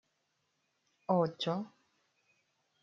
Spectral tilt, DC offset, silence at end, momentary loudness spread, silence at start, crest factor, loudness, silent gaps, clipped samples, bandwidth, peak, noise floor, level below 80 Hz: -5.5 dB/octave; under 0.1%; 1.15 s; 16 LU; 1.1 s; 24 dB; -34 LUFS; none; under 0.1%; 7.4 kHz; -16 dBFS; -80 dBFS; -86 dBFS